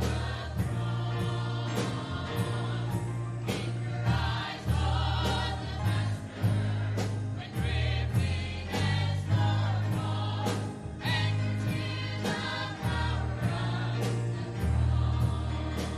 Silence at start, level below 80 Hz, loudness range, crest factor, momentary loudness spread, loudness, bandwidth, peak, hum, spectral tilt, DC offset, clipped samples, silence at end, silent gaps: 0 s; -40 dBFS; 2 LU; 12 dB; 5 LU; -31 LUFS; 13.5 kHz; -18 dBFS; none; -6 dB/octave; under 0.1%; under 0.1%; 0 s; none